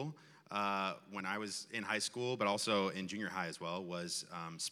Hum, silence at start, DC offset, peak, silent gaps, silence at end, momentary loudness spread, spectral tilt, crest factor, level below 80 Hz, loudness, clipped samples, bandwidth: none; 0 s; under 0.1%; -20 dBFS; none; 0 s; 8 LU; -3.5 dB/octave; 20 dB; under -90 dBFS; -39 LUFS; under 0.1%; 16 kHz